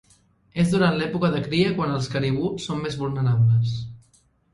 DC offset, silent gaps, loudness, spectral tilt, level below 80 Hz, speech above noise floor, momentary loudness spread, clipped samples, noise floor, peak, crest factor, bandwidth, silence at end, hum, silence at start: under 0.1%; none; -23 LUFS; -7 dB/octave; -52 dBFS; 39 dB; 9 LU; under 0.1%; -61 dBFS; -6 dBFS; 16 dB; 11.5 kHz; 0.55 s; none; 0.55 s